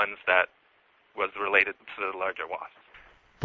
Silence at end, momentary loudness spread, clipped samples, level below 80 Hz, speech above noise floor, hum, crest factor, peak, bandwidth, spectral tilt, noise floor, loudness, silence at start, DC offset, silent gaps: 0 s; 15 LU; under 0.1%; -68 dBFS; 36 dB; none; 24 dB; -6 dBFS; 6.6 kHz; -5 dB/octave; -64 dBFS; -27 LUFS; 0 s; under 0.1%; none